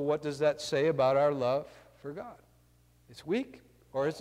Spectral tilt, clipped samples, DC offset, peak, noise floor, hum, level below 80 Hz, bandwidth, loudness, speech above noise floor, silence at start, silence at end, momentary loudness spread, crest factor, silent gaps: -5.5 dB/octave; under 0.1%; under 0.1%; -16 dBFS; -64 dBFS; 60 Hz at -65 dBFS; -68 dBFS; 14.5 kHz; -30 LUFS; 34 dB; 0 s; 0 s; 20 LU; 16 dB; none